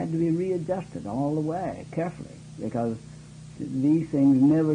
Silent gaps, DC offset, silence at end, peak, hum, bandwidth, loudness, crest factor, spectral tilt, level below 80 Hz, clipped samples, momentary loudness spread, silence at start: none; under 0.1%; 0 s; -12 dBFS; none; 10 kHz; -26 LUFS; 14 dB; -9 dB/octave; -58 dBFS; under 0.1%; 21 LU; 0 s